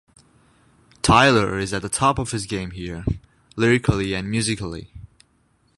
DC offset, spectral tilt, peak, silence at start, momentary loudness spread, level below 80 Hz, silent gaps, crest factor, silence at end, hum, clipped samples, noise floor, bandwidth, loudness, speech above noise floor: under 0.1%; -4.5 dB/octave; 0 dBFS; 1.05 s; 16 LU; -40 dBFS; none; 22 dB; 0.7 s; none; under 0.1%; -63 dBFS; 11.5 kHz; -21 LUFS; 42 dB